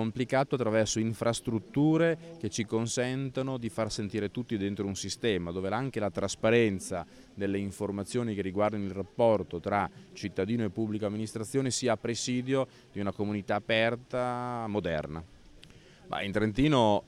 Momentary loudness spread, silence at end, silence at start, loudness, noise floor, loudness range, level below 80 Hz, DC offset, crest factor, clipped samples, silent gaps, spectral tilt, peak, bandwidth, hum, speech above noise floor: 9 LU; 0 s; 0 s; -31 LUFS; -54 dBFS; 3 LU; -56 dBFS; under 0.1%; 18 dB; under 0.1%; none; -5 dB/octave; -12 dBFS; 15.5 kHz; none; 24 dB